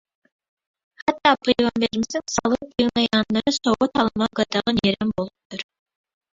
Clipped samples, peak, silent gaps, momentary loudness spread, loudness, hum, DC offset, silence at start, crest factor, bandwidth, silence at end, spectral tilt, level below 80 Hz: under 0.1%; -2 dBFS; 5.45-5.50 s; 11 LU; -21 LUFS; none; under 0.1%; 1.05 s; 20 dB; 7.8 kHz; 0.7 s; -4 dB/octave; -52 dBFS